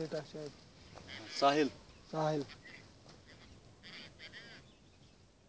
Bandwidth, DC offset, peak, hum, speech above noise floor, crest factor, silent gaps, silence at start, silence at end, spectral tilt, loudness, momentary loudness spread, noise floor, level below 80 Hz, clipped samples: 8 kHz; under 0.1%; -16 dBFS; none; 28 dB; 24 dB; none; 0 s; 0.9 s; -5 dB/octave; -37 LUFS; 26 LU; -63 dBFS; -68 dBFS; under 0.1%